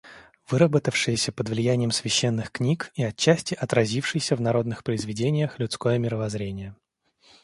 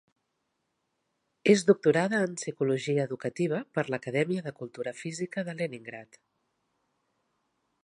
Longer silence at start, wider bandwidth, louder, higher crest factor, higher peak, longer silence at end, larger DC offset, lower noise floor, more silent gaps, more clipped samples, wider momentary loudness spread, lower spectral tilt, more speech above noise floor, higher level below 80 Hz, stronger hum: second, 0.05 s vs 1.45 s; about the same, 11.5 kHz vs 11.5 kHz; first, -25 LUFS vs -29 LUFS; about the same, 22 dB vs 22 dB; first, -4 dBFS vs -8 dBFS; second, 0.7 s vs 1.8 s; neither; second, -61 dBFS vs -79 dBFS; neither; neither; second, 7 LU vs 14 LU; about the same, -5 dB/octave vs -5.5 dB/octave; second, 37 dB vs 51 dB; first, -56 dBFS vs -78 dBFS; neither